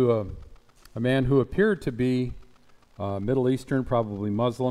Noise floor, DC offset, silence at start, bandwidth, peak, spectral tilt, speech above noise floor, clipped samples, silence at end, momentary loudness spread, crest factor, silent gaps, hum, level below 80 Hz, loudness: -54 dBFS; under 0.1%; 0 s; 12.5 kHz; -8 dBFS; -8 dB/octave; 30 dB; under 0.1%; 0 s; 12 LU; 16 dB; none; none; -46 dBFS; -26 LUFS